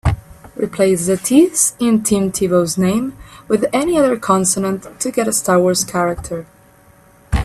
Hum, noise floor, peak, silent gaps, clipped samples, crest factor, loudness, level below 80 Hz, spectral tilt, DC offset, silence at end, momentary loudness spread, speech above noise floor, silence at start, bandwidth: none; -48 dBFS; 0 dBFS; none; under 0.1%; 16 dB; -16 LUFS; -34 dBFS; -4.5 dB/octave; under 0.1%; 0 s; 11 LU; 32 dB; 0.05 s; 15.5 kHz